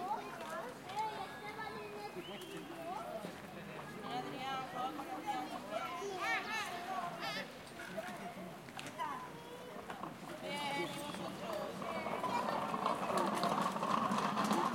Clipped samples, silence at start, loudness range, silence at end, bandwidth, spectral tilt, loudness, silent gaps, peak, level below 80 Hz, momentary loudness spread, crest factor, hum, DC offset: under 0.1%; 0 s; 7 LU; 0 s; 16.5 kHz; -4 dB/octave; -41 LUFS; none; -20 dBFS; -76 dBFS; 12 LU; 20 dB; none; under 0.1%